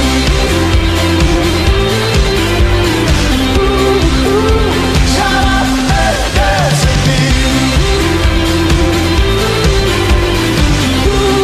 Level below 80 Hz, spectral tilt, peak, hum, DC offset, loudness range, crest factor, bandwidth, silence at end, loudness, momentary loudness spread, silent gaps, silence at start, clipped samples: -16 dBFS; -5 dB/octave; 0 dBFS; none; under 0.1%; 0 LU; 10 dB; 15 kHz; 0 s; -11 LUFS; 1 LU; none; 0 s; under 0.1%